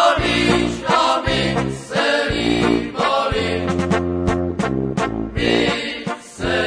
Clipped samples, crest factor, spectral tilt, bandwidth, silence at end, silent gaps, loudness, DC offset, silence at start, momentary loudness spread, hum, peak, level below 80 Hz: under 0.1%; 16 dB; -5 dB/octave; 10.5 kHz; 0 s; none; -19 LUFS; under 0.1%; 0 s; 6 LU; none; -2 dBFS; -36 dBFS